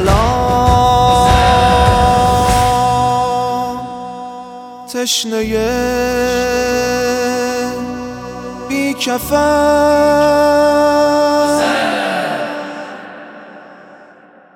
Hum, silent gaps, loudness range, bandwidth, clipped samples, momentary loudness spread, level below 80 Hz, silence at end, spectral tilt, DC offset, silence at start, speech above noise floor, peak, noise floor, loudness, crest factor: none; none; 6 LU; over 20 kHz; under 0.1%; 16 LU; -28 dBFS; 0.6 s; -4.5 dB/octave; under 0.1%; 0 s; 31 dB; 0 dBFS; -43 dBFS; -13 LUFS; 14 dB